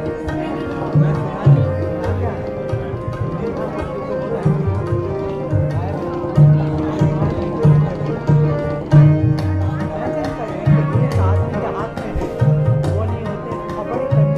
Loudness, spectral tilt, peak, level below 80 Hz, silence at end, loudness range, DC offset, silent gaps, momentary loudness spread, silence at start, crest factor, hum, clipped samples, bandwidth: -18 LUFS; -9.5 dB/octave; -2 dBFS; -36 dBFS; 0 s; 5 LU; under 0.1%; none; 10 LU; 0 s; 14 dB; none; under 0.1%; 6.6 kHz